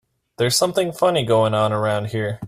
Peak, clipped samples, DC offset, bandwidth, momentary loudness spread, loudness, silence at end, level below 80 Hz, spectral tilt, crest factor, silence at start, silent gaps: -4 dBFS; under 0.1%; under 0.1%; 15.5 kHz; 6 LU; -19 LUFS; 0 s; -56 dBFS; -4.5 dB/octave; 16 dB; 0.4 s; none